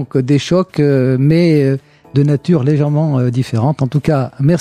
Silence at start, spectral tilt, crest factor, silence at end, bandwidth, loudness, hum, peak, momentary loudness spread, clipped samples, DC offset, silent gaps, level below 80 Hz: 0 s; -8 dB/octave; 10 dB; 0 s; 10 kHz; -14 LUFS; none; -2 dBFS; 5 LU; under 0.1%; under 0.1%; none; -46 dBFS